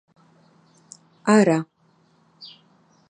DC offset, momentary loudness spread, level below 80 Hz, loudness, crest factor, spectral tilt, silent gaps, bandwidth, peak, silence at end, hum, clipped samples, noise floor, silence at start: under 0.1%; 26 LU; -72 dBFS; -19 LUFS; 22 dB; -6 dB/octave; none; 9.8 kHz; -4 dBFS; 0.65 s; none; under 0.1%; -61 dBFS; 1.25 s